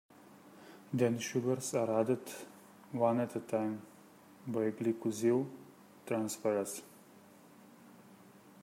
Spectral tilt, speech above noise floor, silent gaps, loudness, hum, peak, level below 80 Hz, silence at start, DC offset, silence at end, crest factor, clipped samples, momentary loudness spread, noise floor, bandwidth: -5.5 dB/octave; 25 dB; none; -35 LUFS; none; -16 dBFS; -82 dBFS; 0.2 s; under 0.1%; 0.15 s; 20 dB; under 0.1%; 21 LU; -59 dBFS; 16 kHz